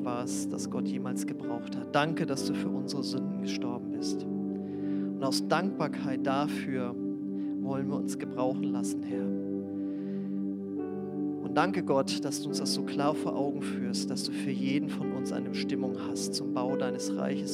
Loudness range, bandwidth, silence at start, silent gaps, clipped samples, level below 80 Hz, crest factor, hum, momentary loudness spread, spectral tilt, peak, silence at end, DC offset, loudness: 2 LU; 15 kHz; 0 s; none; under 0.1%; -86 dBFS; 20 dB; 50 Hz at -55 dBFS; 6 LU; -5 dB/octave; -10 dBFS; 0 s; under 0.1%; -32 LUFS